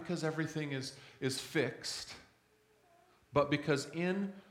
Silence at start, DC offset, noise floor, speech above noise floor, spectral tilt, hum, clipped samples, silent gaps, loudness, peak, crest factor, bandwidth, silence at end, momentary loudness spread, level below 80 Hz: 0 s; under 0.1%; -70 dBFS; 34 dB; -5 dB/octave; none; under 0.1%; none; -37 LUFS; -16 dBFS; 22 dB; 17 kHz; 0.1 s; 10 LU; -70 dBFS